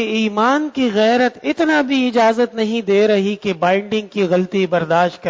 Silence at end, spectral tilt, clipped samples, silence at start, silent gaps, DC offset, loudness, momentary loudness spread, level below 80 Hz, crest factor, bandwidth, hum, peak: 0 s; -5.5 dB/octave; under 0.1%; 0 s; none; under 0.1%; -16 LUFS; 4 LU; -60 dBFS; 14 dB; 7.8 kHz; none; -2 dBFS